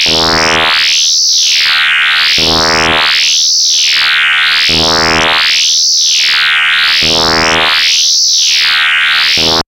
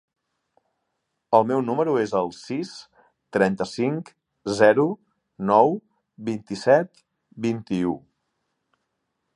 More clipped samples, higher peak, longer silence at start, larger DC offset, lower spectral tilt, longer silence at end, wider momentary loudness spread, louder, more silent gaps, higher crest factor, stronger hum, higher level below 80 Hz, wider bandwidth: neither; about the same, 0 dBFS vs -2 dBFS; second, 0 s vs 1.3 s; neither; second, 0 dB/octave vs -6.5 dB/octave; second, 0.05 s vs 1.35 s; second, 1 LU vs 16 LU; first, -6 LUFS vs -23 LUFS; neither; second, 8 dB vs 22 dB; neither; first, -36 dBFS vs -64 dBFS; first, 17 kHz vs 11 kHz